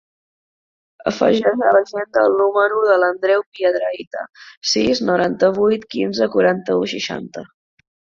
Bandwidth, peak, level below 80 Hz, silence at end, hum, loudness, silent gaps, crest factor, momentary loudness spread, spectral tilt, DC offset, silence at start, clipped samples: 7.6 kHz; -2 dBFS; -58 dBFS; 0.75 s; none; -17 LUFS; 3.46-3.52 s, 4.07-4.11 s, 4.57-4.61 s; 18 dB; 12 LU; -4.5 dB/octave; under 0.1%; 1.05 s; under 0.1%